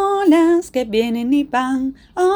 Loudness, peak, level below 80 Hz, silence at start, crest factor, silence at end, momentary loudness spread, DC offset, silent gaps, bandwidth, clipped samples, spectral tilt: -17 LUFS; -4 dBFS; -50 dBFS; 0 s; 12 dB; 0 s; 8 LU; under 0.1%; none; over 20 kHz; under 0.1%; -5 dB/octave